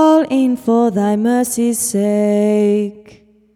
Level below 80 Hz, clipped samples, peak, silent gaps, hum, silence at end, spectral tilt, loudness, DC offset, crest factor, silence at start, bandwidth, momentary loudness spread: -60 dBFS; under 0.1%; -2 dBFS; none; none; 0.55 s; -5.5 dB/octave; -15 LUFS; under 0.1%; 12 dB; 0 s; 16 kHz; 3 LU